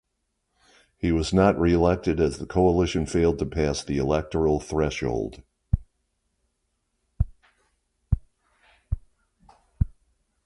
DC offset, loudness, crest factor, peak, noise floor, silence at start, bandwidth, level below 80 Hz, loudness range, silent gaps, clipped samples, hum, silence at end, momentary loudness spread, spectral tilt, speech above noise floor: under 0.1%; -25 LUFS; 20 dB; -6 dBFS; -77 dBFS; 1.05 s; 11.5 kHz; -36 dBFS; 13 LU; none; under 0.1%; none; 0.55 s; 11 LU; -6.5 dB/octave; 54 dB